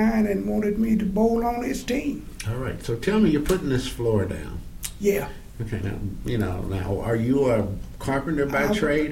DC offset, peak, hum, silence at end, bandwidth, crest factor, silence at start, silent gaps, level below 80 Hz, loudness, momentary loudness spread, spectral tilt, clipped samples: under 0.1%; -8 dBFS; none; 0 s; 16.5 kHz; 16 dB; 0 s; none; -38 dBFS; -25 LUFS; 11 LU; -6.5 dB/octave; under 0.1%